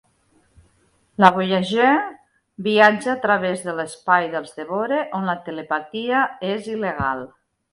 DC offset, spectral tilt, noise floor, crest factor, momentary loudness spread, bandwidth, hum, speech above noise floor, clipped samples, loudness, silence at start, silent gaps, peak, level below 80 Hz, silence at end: under 0.1%; -5.5 dB/octave; -61 dBFS; 22 dB; 13 LU; 11.5 kHz; none; 41 dB; under 0.1%; -20 LUFS; 1.2 s; none; 0 dBFS; -54 dBFS; 0.45 s